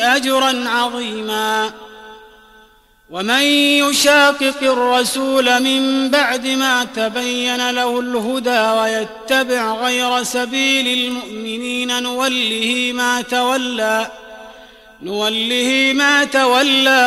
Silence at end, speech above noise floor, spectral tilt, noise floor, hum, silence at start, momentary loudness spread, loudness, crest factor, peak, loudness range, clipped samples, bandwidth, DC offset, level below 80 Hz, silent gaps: 0 s; 34 dB; -1.5 dB/octave; -50 dBFS; none; 0 s; 9 LU; -15 LUFS; 14 dB; -2 dBFS; 5 LU; under 0.1%; 15.5 kHz; under 0.1%; -56 dBFS; none